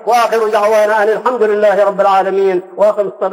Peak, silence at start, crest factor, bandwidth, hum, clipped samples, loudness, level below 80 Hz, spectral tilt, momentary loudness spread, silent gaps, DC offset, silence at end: -2 dBFS; 0 s; 10 dB; 16 kHz; none; under 0.1%; -12 LUFS; -64 dBFS; -4.5 dB/octave; 3 LU; none; under 0.1%; 0 s